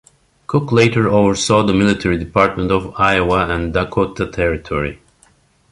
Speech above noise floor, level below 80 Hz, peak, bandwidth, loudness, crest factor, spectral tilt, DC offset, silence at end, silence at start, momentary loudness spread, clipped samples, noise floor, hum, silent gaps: 38 dB; -34 dBFS; 0 dBFS; 11.5 kHz; -16 LUFS; 16 dB; -5.5 dB/octave; under 0.1%; 0.75 s; 0.5 s; 7 LU; under 0.1%; -54 dBFS; none; none